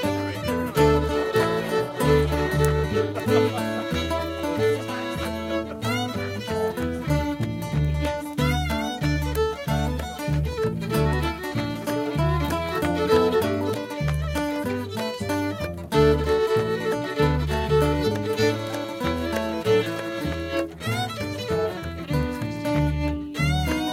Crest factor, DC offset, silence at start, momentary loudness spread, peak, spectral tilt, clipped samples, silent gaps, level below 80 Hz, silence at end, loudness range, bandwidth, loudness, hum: 18 dB; under 0.1%; 0 s; 7 LU; -6 dBFS; -6 dB/octave; under 0.1%; none; -34 dBFS; 0 s; 4 LU; 16.5 kHz; -25 LUFS; none